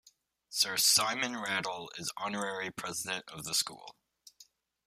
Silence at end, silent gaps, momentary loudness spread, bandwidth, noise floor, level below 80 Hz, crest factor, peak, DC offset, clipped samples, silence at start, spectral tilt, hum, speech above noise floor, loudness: 0.45 s; none; 14 LU; 15.5 kHz; -64 dBFS; -74 dBFS; 24 dB; -12 dBFS; under 0.1%; under 0.1%; 0.5 s; -0.5 dB/octave; none; 30 dB; -31 LUFS